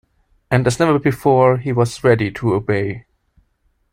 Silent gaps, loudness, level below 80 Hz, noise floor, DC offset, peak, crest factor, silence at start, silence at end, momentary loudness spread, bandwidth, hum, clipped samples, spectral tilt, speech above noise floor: none; -17 LUFS; -46 dBFS; -63 dBFS; under 0.1%; -2 dBFS; 16 dB; 0.5 s; 0.95 s; 7 LU; 15 kHz; none; under 0.1%; -7 dB/octave; 48 dB